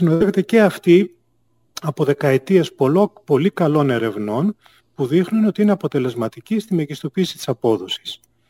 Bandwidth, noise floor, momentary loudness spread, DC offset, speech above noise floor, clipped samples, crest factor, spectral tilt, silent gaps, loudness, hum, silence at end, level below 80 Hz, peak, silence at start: 16 kHz; -65 dBFS; 11 LU; under 0.1%; 48 dB; under 0.1%; 16 dB; -7 dB/octave; none; -18 LUFS; none; 0.35 s; -60 dBFS; -2 dBFS; 0 s